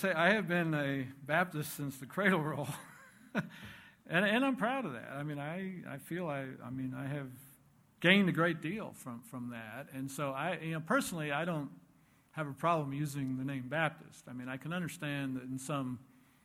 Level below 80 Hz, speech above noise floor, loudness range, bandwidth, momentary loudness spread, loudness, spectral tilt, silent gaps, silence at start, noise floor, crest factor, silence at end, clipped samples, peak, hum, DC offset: -74 dBFS; 31 dB; 4 LU; 17 kHz; 16 LU; -35 LUFS; -5.5 dB/octave; none; 0 s; -67 dBFS; 26 dB; 0.4 s; under 0.1%; -10 dBFS; none; under 0.1%